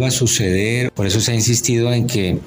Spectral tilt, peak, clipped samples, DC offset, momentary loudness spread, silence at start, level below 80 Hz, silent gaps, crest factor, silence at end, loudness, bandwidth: -4 dB/octave; -4 dBFS; under 0.1%; under 0.1%; 4 LU; 0 s; -42 dBFS; none; 12 dB; 0 s; -16 LUFS; 16 kHz